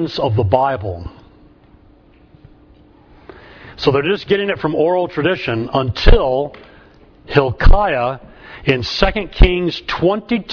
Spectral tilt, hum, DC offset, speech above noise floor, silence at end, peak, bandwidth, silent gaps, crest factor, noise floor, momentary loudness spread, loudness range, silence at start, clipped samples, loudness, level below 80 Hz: -7 dB/octave; none; under 0.1%; 33 dB; 0 s; 0 dBFS; 5.4 kHz; none; 16 dB; -48 dBFS; 11 LU; 7 LU; 0 s; under 0.1%; -17 LUFS; -20 dBFS